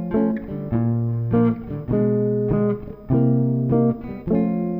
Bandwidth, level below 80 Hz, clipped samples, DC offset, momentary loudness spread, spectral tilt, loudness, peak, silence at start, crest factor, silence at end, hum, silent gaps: 3.2 kHz; -42 dBFS; under 0.1%; under 0.1%; 6 LU; -13.5 dB/octave; -21 LUFS; -8 dBFS; 0 s; 12 dB; 0 s; none; none